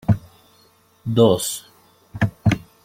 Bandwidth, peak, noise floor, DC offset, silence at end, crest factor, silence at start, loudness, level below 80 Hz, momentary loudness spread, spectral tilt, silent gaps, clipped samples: 16.5 kHz; -2 dBFS; -56 dBFS; under 0.1%; 0.25 s; 20 dB; 0.1 s; -20 LUFS; -44 dBFS; 16 LU; -6 dB/octave; none; under 0.1%